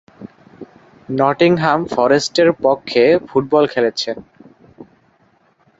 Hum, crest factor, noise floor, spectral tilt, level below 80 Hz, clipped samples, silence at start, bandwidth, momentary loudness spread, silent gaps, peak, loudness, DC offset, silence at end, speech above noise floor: none; 16 dB; -56 dBFS; -5 dB/octave; -56 dBFS; under 0.1%; 0.2 s; 8 kHz; 9 LU; none; -2 dBFS; -15 LUFS; under 0.1%; 0.95 s; 42 dB